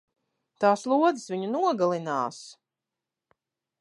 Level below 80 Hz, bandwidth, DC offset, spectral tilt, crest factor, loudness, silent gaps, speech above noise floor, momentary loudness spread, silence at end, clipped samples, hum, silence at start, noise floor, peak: -84 dBFS; 11.5 kHz; under 0.1%; -5.5 dB/octave; 20 dB; -26 LUFS; none; 63 dB; 9 LU; 1.3 s; under 0.1%; none; 0.6 s; -88 dBFS; -8 dBFS